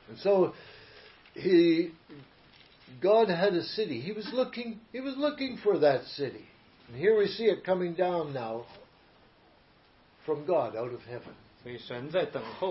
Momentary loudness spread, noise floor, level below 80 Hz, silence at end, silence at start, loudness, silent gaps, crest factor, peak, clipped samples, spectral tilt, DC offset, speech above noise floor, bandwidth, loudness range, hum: 19 LU; -62 dBFS; -70 dBFS; 0 s; 0.1 s; -29 LUFS; none; 18 dB; -12 dBFS; under 0.1%; -9.5 dB/octave; under 0.1%; 33 dB; 5.8 kHz; 7 LU; none